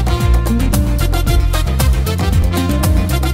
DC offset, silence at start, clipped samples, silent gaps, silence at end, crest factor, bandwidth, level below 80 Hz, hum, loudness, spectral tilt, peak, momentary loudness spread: under 0.1%; 0 s; under 0.1%; none; 0 s; 12 dB; 16.5 kHz; -16 dBFS; none; -15 LUFS; -5.5 dB/octave; -2 dBFS; 2 LU